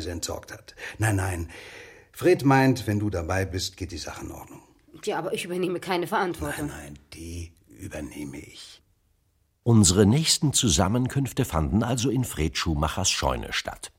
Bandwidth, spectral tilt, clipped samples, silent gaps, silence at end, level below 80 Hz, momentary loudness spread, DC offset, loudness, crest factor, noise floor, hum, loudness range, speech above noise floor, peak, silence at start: 16.5 kHz; -4.5 dB/octave; under 0.1%; none; 0.1 s; -42 dBFS; 22 LU; under 0.1%; -24 LUFS; 22 dB; -68 dBFS; none; 9 LU; 43 dB; -4 dBFS; 0 s